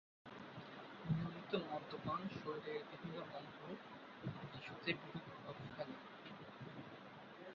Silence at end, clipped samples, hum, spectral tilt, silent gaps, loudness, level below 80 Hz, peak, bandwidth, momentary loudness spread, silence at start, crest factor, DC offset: 0 s; under 0.1%; none; -4.5 dB/octave; none; -48 LUFS; -74 dBFS; -24 dBFS; 7 kHz; 11 LU; 0.25 s; 24 dB; under 0.1%